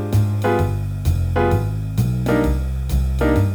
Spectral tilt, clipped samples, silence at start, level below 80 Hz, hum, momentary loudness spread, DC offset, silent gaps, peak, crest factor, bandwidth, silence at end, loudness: -8 dB/octave; under 0.1%; 0 s; -24 dBFS; none; 4 LU; under 0.1%; none; -6 dBFS; 12 dB; over 20 kHz; 0 s; -20 LUFS